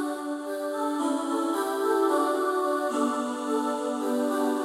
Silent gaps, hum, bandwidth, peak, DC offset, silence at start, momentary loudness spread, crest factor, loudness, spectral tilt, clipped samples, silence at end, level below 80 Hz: none; none; 16 kHz; -14 dBFS; under 0.1%; 0 s; 7 LU; 14 dB; -27 LUFS; -3 dB/octave; under 0.1%; 0 s; -80 dBFS